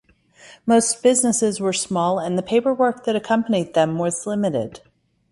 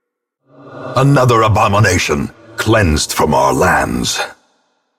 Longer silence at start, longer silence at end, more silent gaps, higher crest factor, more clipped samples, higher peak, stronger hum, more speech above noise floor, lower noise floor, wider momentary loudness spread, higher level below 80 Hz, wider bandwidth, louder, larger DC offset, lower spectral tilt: second, 0.45 s vs 0.65 s; about the same, 0.55 s vs 0.65 s; neither; about the same, 16 dB vs 14 dB; neither; about the same, -4 dBFS vs -2 dBFS; neither; second, 30 dB vs 52 dB; second, -49 dBFS vs -64 dBFS; about the same, 7 LU vs 9 LU; second, -62 dBFS vs -32 dBFS; second, 11.5 kHz vs 16.5 kHz; second, -20 LUFS vs -13 LUFS; neither; about the same, -4 dB/octave vs -5 dB/octave